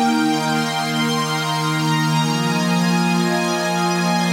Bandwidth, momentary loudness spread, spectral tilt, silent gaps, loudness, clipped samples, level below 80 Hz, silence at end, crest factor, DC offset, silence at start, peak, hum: 16 kHz; 2 LU; -4.5 dB/octave; none; -18 LUFS; under 0.1%; -66 dBFS; 0 s; 12 dB; under 0.1%; 0 s; -8 dBFS; none